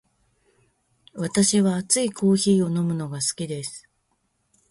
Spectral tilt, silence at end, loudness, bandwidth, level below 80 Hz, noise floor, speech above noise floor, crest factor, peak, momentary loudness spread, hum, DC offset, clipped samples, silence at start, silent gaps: -4.5 dB/octave; 0.9 s; -22 LUFS; 11.5 kHz; -62 dBFS; -71 dBFS; 49 dB; 20 dB; -4 dBFS; 14 LU; none; under 0.1%; under 0.1%; 1.15 s; none